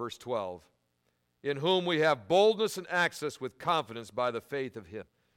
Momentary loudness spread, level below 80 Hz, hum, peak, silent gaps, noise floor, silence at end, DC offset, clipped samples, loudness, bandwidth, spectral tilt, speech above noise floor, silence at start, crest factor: 15 LU; -72 dBFS; none; -14 dBFS; none; -76 dBFS; 0.35 s; under 0.1%; under 0.1%; -30 LUFS; 16.5 kHz; -4.5 dB/octave; 46 dB; 0 s; 18 dB